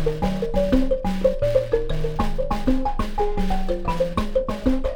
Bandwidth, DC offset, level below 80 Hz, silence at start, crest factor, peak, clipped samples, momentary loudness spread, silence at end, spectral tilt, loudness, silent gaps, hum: 9.8 kHz; under 0.1%; -26 dBFS; 0 s; 16 dB; -6 dBFS; under 0.1%; 5 LU; 0 s; -7.5 dB/octave; -24 LUFS; none; none